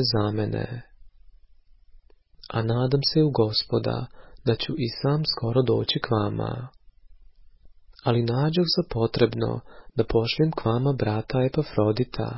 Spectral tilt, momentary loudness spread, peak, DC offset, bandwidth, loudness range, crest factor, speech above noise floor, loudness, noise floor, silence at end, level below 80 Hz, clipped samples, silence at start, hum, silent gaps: -10 dB/octave; 10 LU; -6 dBFS; under 0.1%; 5.8 kHz; 3 LU; 20 dB; 29 dB; -25 LUFS; -53 dBFS; 0 s; -48 dBFS; under 0.1%; 0 s; none; none